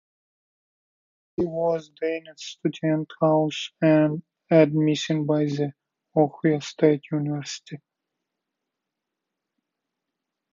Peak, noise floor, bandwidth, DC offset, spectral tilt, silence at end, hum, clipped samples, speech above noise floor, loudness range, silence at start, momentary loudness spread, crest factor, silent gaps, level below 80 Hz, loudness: -4 dBFS; -84 dBFS; 7.6 kHz; under 0.1%; -6.5 dB/octave; 2.75 s; none; under 0.1%; 61 dB; 7 LU; 1.4 s; 14 LU; 20 dB; none; -68 dBFS; -24 LUFS